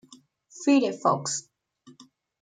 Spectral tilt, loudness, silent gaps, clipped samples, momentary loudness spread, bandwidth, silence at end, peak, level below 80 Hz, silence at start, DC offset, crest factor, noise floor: -4 dB/octave; -25 LUFS; none; under 0.1%; 9 LU; 9.4 kHz; 1 s; -8 dBFS; -80 dBFS; 0.55 s; under 0.1%; 20 dB; -56 dBFS